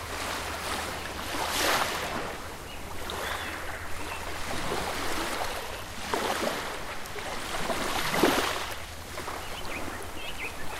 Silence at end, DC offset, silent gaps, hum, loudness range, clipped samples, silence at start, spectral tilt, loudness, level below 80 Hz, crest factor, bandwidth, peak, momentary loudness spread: 0 s; under 0.1%; none; none; 4 LU; under 0.1%; 0 s; -2.5 dB/octave; -31 LUFS; -44 dBFS; 22 dB; 16 kHz; -10 dBFS; 12 LU